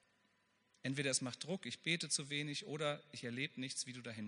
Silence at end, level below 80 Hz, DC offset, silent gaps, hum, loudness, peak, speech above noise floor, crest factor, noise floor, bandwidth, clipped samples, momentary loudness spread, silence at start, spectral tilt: 0 s; -86 dBFS; under 0.1%; none; none; -41 LUFS; -22 dBFS; 35 dB; 22 dB; -78 dBFS; 10.5 kHz; under 0.1%; 8 LU; 0.85 s; -3 dB/octave